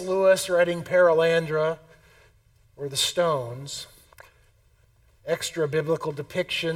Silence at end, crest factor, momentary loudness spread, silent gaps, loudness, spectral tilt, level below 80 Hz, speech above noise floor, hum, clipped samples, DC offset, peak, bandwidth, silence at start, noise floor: 0 s; 18 dB; 16 LU; none; -24 LUFS; -4 dB/octave; -62 dBFS; 37 dB; none; under 0.1%; under 0.1%; -8 dBFS; 16.5 kHz; 0 s; -61 dBFS